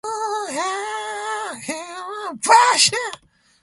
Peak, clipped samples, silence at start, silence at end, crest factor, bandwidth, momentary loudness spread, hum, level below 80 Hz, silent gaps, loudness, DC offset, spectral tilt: -2 dBFS; under 0.1%; 0.05 s; 0.45 s; 20 dB; 11.5 kHz; 16 LU; none; -66 dBFS; none; -19 LUFS; under 0.1%; 0 dB/octave